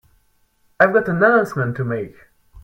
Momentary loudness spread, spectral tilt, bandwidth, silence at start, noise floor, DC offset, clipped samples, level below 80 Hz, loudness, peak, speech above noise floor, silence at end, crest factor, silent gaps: 11 LU; -8 dB/octave; 16.5 kHz; 0.8 s; -61 dBFS; under 0.1%; under 0.1%; -54 dBFS; -18 LUFS; 0 dBFS; 43 dB; 0.05 s; 20 dB; none